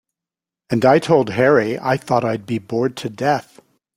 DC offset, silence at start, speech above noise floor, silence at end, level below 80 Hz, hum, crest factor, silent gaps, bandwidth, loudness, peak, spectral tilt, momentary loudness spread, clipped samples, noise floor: under 0.1%; 0.7 s; 71 dB; 0.55 s; -58 dBFS; none; 18 dB; none; 15.5 kHz; -18 LUFS; -2 dBFS; -6.5 dB/octave; 9 LU; under 0.1%; -88 dBFS